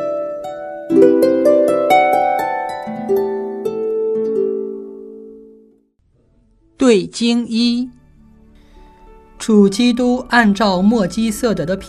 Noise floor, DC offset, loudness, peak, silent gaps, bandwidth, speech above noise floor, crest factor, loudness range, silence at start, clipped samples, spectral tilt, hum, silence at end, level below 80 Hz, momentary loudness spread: -58 dBFS; under 0.1%; -15 LUFS; 0 dBFS; none; 14 kHz; 43 dB; 16 dB; 7 LU; 0 s; under 0.1%; -5.5 dB/octave; none; 0 s; -48 dBFS; 15 LU